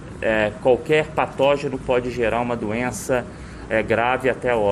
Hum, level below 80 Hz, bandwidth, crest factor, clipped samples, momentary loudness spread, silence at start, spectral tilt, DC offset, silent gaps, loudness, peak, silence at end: none; -42 dBFS; 13.5 kHz; 18 dB; under 0.1%; 5 LU; 0 s; -5.5 dB/octave; under 0.1%; none; -21 LUFS; -4 dBFS; 0 s